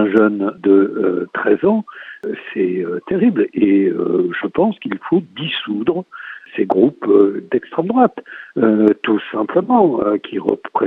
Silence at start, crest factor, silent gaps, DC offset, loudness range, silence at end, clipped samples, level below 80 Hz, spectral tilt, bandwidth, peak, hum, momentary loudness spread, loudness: 0 s; 16 dB; none; under 0.1%; 2 LU; 0 s; under 0.1%; -60 dBFS; -9 dB/octave; 4 kHz; 0 dBFS; none; 11 LU; -17 LUFS